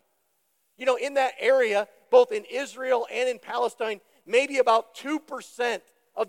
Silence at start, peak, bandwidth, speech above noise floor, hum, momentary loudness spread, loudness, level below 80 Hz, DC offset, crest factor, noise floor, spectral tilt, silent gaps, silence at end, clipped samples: 0.8 s; -6 dBFS; 14 kHz; 47 dB; none; 11 LU; -25 LUFS; under -90 dBFS; under 0.1%; 18 dB; -72 dBFS; -2 dB/octave; none; 0.05 s; under 0.1%